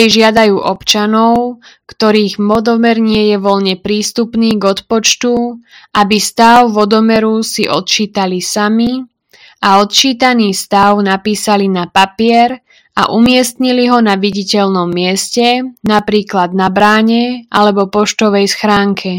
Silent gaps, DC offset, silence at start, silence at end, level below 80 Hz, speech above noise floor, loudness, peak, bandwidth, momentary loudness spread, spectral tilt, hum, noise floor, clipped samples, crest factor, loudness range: none; under 0.1%; 0 s; 0 s; -46 dBFS; 33 dB; -11 LUFS; 0 dBFS; 17.5 kHz; 6 LU; -4 dB/octave; none; -44 dBFS; 0.9%; 10 dB; 2 LU